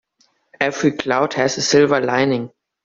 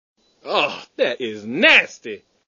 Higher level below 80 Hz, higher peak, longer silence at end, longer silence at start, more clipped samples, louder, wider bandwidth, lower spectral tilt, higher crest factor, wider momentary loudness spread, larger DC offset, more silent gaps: first, -58 dBFS vs -70 dBFS; about the same, -2 dBFS vs 0 dBFS; about the same, 0.4 s vs 0.3 s; first, 0.6 s vs 0.45 s; neither; about the same, -17 LUFS vs -17 LUFS; about the same, 7.6 kHz vs 7.4 kHz; about the same, -4 dB/octave vs -3 dB/octave; about the same, 16 dB vs 20 dB; second, 8 LU vs 18 LU; neither; neither